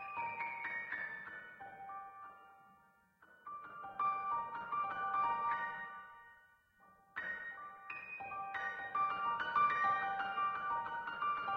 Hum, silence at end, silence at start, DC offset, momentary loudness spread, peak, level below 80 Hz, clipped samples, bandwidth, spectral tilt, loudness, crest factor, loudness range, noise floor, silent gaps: none; 0 s; 0 s; under 0.1%; 17 LU; -22 dBFS; -78 dBFS; under 0.1%; 6.4 kHz; -4 dB/octave; -39 LUFS; 18 dB; 9 LU; -69 dBFS; none